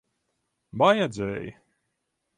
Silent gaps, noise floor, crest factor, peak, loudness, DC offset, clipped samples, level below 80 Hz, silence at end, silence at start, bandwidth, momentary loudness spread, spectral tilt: none; -79 dBFS; 22 dB; -6 dBFS; -24 LUFS; under 0.1%; under 0.1%; -60 dBFS; 0.85 s; 0.75 s; 10.5 kHz; 20 LU; -5.5 dB/octave